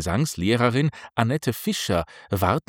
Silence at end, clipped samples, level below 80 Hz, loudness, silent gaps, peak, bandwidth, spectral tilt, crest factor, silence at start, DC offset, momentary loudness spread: 0.1 s; under 0.1%; -50 dBFS; -24 LUFS; none; -4 dBFS; 18 kHz; -5.5 dB/octave; 20 dB; 0 s; under 0.1%; 5 LU